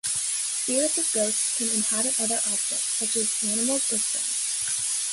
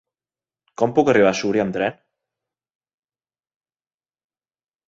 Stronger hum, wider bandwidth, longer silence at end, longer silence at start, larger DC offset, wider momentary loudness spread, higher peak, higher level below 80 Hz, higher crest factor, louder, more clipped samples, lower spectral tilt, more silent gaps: neither; first, 12 kHz vs 8 kHz; second, 0 s vs 2.95 s; second, 0.05 s vs 0.8 s; neither; second, 3 LU vs 9 LU; second, -10 dBFS vs -2 dBFS; second, -70 dBFS vs -62 dBFS; second, 16 dB vs 22 dB; second, -23 LUFS vs -19 LUFS; neither; second, -0.5 dB/octave vs -5.5 dB/octave; neither